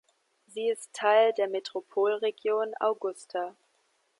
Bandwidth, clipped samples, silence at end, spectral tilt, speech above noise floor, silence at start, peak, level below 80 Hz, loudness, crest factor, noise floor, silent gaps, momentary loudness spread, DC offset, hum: 11.5 kHz; under 0.1%; 0.7 s; -2.5 dB/octave; 44 dB; 0.55 s; -12 dBFS; -90 dBFS; -28 LUFS; 18 dB; -72 dBFS; none; 12 LU; under 0.1%; none